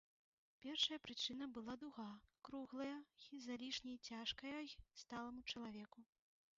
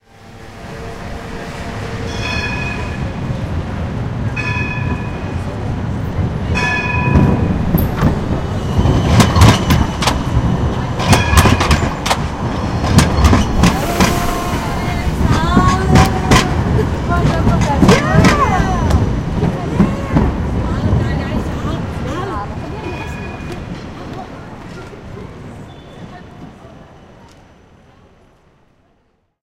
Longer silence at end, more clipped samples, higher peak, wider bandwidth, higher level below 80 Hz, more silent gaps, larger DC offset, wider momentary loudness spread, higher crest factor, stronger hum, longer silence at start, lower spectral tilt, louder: second, 0.55 s vs 2.3 s; neither; second, -28 dBFS vs 0 dBFS; second, 7.4 kHz vs 16.5 kHz; second, -76 dBFS vs -22 dBFS; neither; neither; about the same, 16 LU vs 18 LU; first, 24 dB vs 16 dB; neither; first, 0.6 s vs 0.2 s; second, -1 dB/octave vs -5.5 dB/octave; second, -49 LUFS vs -15 LUFS